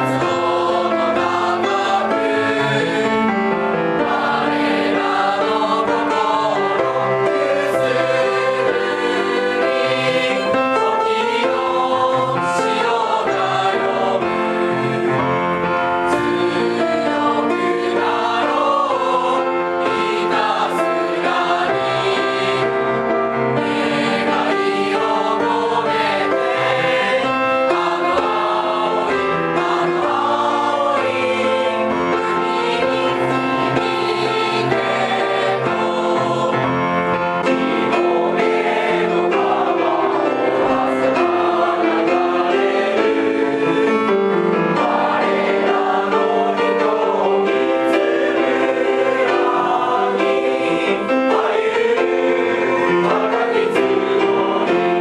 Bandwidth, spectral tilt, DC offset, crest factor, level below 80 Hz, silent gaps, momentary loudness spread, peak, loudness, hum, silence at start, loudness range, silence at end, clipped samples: 12 kHz; -5.5 dB/octave; under 0.1%; 16 dB; -56 dBFS; none; 2 LU; -2 dBFS; -17 LUFS; none; 0 s; 1 LU; 0 s; under 0.1%